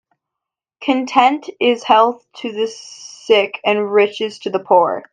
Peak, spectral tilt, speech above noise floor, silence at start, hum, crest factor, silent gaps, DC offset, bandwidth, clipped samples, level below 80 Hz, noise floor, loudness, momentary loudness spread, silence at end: 0 dBFS; -4 dB/octave; 68 dB; 0.8 s; none; 16 dB; none; under 0.1%; 9.4 kHz; under 0.1%; -64 dBFS; -84 dBFS; -16 LUFS; 13 LU; 0.1 s